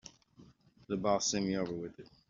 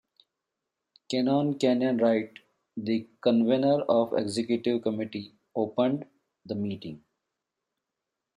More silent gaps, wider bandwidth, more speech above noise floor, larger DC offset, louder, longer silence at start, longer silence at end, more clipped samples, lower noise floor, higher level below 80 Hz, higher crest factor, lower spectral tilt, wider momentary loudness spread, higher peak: neither; second, 7.8 kHz vs 10.5 kHz; second, 27 dB vs 60 dB; neither; second, -34 LUFS vs -27 LUFS; second, 0.05 s vs 1.1 s; second, 0.25 s vs 1.4 s; neither; second, -61 dBFS vs -86 dBFS; first, -66 dBFS vs -74 dBFS; about the same, 20 dB vs 18 dB; second, -4.5 dB/octave vs -6.5 dB/octave; about the same, 15 LU vs 13 LU; second, -18 dBFS vs -10 dBFS